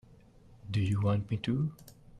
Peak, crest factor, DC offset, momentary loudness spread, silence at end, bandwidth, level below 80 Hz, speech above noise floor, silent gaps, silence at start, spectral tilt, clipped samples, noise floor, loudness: -20 dBFS; 14 dB; under 0.1%; 7 LU; 0 s; 12 kHz; -58 dBFS; 27 dB; none; 0.65 s; -8 dB/octave; under 0.1%; -57 dBFS; -32 LUFS